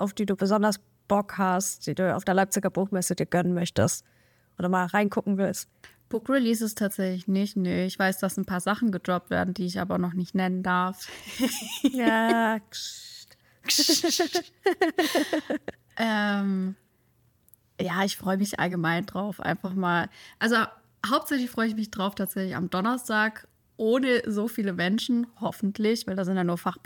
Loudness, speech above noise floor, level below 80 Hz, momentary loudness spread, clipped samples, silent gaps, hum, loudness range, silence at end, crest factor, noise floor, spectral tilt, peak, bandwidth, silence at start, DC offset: -27 LUFS; 39 dB; -64 dBFS; 9 LU; under 0.1%; none; none; 3 LU; 0.1 s; 18 dB; -66 dBFS; -4.5 dB/octave; -8 dBFS; 18 kHz; 0 s; under 0.1%